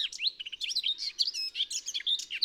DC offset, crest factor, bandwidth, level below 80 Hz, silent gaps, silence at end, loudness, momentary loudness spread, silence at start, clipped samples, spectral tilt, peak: under 0.1%; 20 dB; 18 kHz; -74 dBFS; none; 0 s; -30 LUFS; 3 LU; 0 s; under 0.1%; 4.5 dB/octave; -14 dBFS